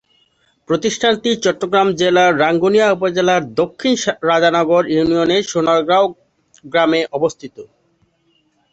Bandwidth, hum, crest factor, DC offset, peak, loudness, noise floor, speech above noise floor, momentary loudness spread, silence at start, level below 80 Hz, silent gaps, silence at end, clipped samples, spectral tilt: 8.2 kHz; none; 14 dB; under 0.1%; -2 dBFS; -15 LUFS; -61 dBFS; 46 dB; 7 LU; 0.7 s; -56 dBFS; none; 1.1 s; under 0.1%; -4.5 dB/octave